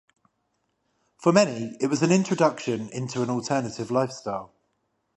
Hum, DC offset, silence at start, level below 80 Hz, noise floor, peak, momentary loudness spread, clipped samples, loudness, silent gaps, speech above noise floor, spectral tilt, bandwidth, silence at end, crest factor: none; under 0.1%; 1.2 s; -68 dBFS; -74 dBFS; -2 dBFS; 10 LU; under 0.1%; -25 LUFS; none; 50 dB; -5.5 dB/octave; 11.5 kHz; 0.7 s; 24 dB